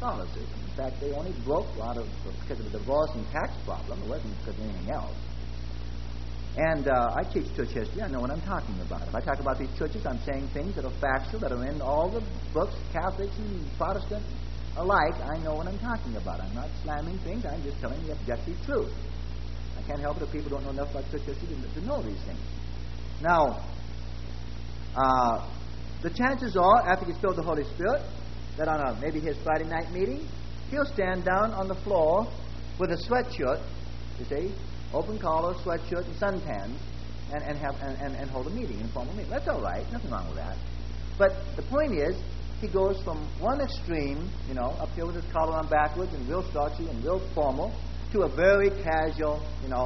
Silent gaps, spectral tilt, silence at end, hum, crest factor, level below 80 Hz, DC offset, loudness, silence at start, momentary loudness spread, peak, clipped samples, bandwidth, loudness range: none; -7 dB/octave; 0 s; none; 22 dB; -38 dBFS; 1%; -30 LUFS; 0 s; 13 LU; -8 dBFS; under 0.1%; 6.2 kHz; 7 LU